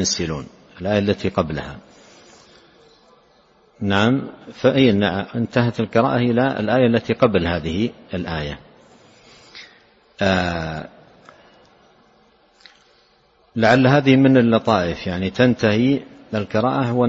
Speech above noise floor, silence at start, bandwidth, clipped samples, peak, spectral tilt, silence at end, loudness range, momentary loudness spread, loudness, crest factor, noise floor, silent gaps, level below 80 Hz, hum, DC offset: 39 dB; 0 s; 7.8 kHz; under 0.1%; -2 dBFS; -6 dB/octave; 0 s; 10 LU; 16 LU; -19 LUFS; 18 dB; -57 dBFS; none; -46 dBFS; none; under 0.1%